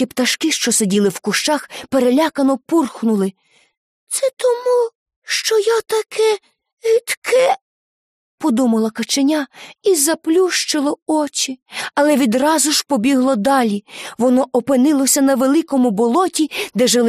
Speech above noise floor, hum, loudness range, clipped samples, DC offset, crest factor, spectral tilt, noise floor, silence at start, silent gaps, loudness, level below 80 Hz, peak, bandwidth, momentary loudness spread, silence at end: over 74 dB; none; 3 LU; under 0.1%; under 0.1%; 14 dB; -3 dB/octave; under -90 dBFS; 0 s; 3.77-4.07 s, 4.95-5.06 s, 5.16-5.22 s, 6.73-6.77 s, 7.17-7.22 s, 7.62-8.38 s, 11.02-11.06 s, 11.62-11.66 s; -16 LUFS; -64 dBFS; -2 dBFS; 15.5 kHz; 7 LU; 0 s